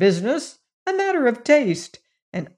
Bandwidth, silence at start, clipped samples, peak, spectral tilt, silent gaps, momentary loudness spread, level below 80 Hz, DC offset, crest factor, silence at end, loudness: 11 kHz; 0 s; under 0.1%; -4 dBFS; -5.5 dB/octave; 0.73-0.86 s, 2.22-2.32 s; 15 LU; -70 dBFS; under 0.1%; 16 dB; 0.1 s; -21 LUFS